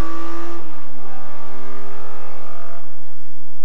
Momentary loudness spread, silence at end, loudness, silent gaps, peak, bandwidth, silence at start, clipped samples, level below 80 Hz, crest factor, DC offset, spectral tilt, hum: 17 LU; 0 s; -37 LUFS; none; -4 dBFS; 11.5 kHz; 0 s; under 0.1%; -58 dBFS; 16 dB; 50%; -7 dB/octave; none